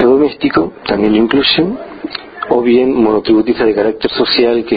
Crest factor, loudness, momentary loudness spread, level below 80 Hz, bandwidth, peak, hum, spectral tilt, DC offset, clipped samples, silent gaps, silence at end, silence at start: 12 dB; -12 LUFS; 12 LU; -42 dBFS; 5 kHz; 0 dBFS; none; -8.5 dB/octave; under 0.1%; under 0.1%; none; 0 s; 0 s